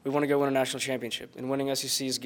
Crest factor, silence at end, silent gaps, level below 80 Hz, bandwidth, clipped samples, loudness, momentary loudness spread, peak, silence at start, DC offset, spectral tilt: 16 dB; 0 s; none; -72 dBFS; 19.5 kHz; under 0.1%; -29 LUFS; 8 LU; -12 dBFS; 0.05 s; under 0.1%; -3.5 dB/octave